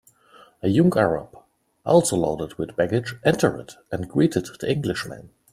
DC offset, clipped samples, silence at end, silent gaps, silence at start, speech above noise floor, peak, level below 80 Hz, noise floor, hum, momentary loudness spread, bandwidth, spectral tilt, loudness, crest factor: under 0.1%; under 0.1%; 0.25 s; none; 0.65 s; 31 dB; -4 dBFS; -54 dBFS; -53 dBFS; none; 14 LU; 14.5 kHz; -6 dB/octave; -22 LUFS; 20 dB